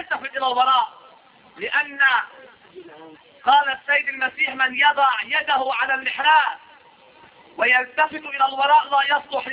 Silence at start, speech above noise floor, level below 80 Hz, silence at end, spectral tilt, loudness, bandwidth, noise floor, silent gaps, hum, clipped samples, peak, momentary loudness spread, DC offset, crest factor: 0 s; 30 dB; -70 dBFS; 0 s; -4 dB/octave; -19 LUFS; 4 kHz; -50 dBFS; none; none; under 0.1%; -4 dBFS; 7 LU; under 0.1%; 16 dB